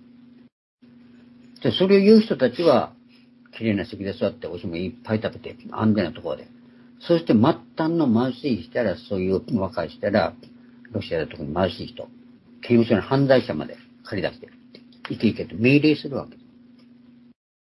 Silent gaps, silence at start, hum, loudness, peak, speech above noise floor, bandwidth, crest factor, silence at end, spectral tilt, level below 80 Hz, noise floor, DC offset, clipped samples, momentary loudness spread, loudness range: none; 1.6 s; none; -22 LUFS; -2 dBFS; 31 dB; 11.5 kHz; 20 dB; 1.35 s; -8.5 dB/octave; -60 dBFS; -52 dBFS; under 0.1%; under 0.1%; 17 LU; 6 LU